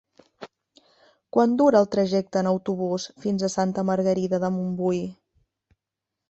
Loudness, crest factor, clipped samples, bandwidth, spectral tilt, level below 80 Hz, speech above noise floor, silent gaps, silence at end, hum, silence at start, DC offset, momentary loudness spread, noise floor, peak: -23 LUFS; 20 dB; under 0.1%; 8.2 kHz; -6.5 dB/octave; -64 dBFS; 63 dB; none; 1.15 s; none; 0.4 s; under 0.1%; 10 LU; -86 dBFS; -6 dBFS